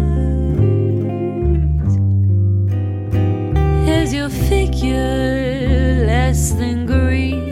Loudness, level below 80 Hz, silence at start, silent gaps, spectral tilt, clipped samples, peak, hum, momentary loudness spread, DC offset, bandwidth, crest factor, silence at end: -17 LUFS; -20 dBFS; 0 s; none; -6.5 dB/octave; under 0.1%; -2 dBFS; none; 4 LU; under 0.1%; 14.5 kHz; 12 dB; 0 s